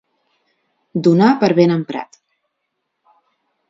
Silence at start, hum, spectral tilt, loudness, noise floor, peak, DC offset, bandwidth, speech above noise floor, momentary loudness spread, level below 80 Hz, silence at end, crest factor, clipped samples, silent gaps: 0.95 s; none; -8 dB/octave; -15 LUFS; -74 dBFS; 0 dBFS; under 0.1%; 7.6 kHz; 60 dB; 15 LU; -64 dBFS; 1.65 s; 18 dB; under 0.1%; none